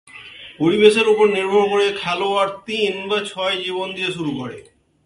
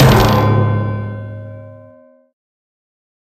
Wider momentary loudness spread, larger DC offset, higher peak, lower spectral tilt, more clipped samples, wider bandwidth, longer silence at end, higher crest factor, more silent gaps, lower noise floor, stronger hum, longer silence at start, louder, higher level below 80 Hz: second, 14 LU vs 22 LU; neither; about the same, 0 dBFS vs 0 dBFS; second, -4.5 dB/octave vs -6.5 dB/octave; neither; second, 11.5 kHz vs 14.5 kHz; second, 0.45 s vs 1.55 s; about the same, 18 dB vs 16 dB; neither; second, -39 dBFS vs -45 dBFS; neither; first, 0.15 s vs 0 s; second, -18 LUFS vs -14 LUFS; second, -60 dBFS vs -30 dBFS